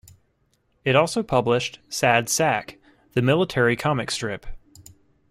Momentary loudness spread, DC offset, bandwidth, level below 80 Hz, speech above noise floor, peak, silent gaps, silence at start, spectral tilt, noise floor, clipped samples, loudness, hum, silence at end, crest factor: 9 LU; under 0.1%; 15.5 kHz; -48 dBFS; 46 dB; -4 dBFS; none; 0.85 s; -4.5 dB/octave; -67 dBFS; under 0.1%; -22 LUFS; none; 0.75 s; 20 dB